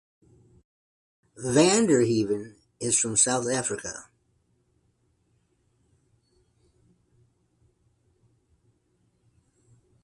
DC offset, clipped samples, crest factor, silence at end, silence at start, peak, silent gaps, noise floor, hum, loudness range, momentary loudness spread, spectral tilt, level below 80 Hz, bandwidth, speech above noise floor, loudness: under 0.1%; under 0.1%; 24 dB; 6 s; 1.4 s; -6 dBFS; none; -70 dBFS; none; 12 LU; 16 LU; -3.5 dB/octave; -64 dBFS; 11.5 kHz; 46 dB; -24 LUFS